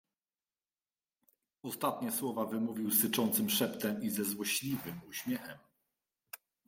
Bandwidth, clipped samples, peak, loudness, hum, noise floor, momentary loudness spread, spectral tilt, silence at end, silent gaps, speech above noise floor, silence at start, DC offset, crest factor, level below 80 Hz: 16.5 kHz; under 0.1%; -18 dBFS; -34 LUFS; none; under -90 dBFS; 17 LU; -3.5 dB/octave; 0.3 s; none; over 55 dB; 1.65 s; under 0.1%; 20 dB; -76 dBFS